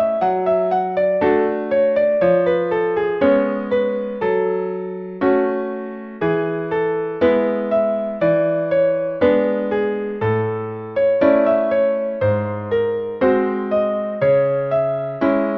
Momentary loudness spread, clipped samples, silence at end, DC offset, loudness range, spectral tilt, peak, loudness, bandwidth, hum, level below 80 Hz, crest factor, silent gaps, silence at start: 6 LU; under 0.1%; 0 s; under 0.1%; 3 LU; -9.5 dB/octave; -4 dBFS; -19 LUFS; 5.2 kHz; none; -54 dBFS; 14 dB; none; 0 s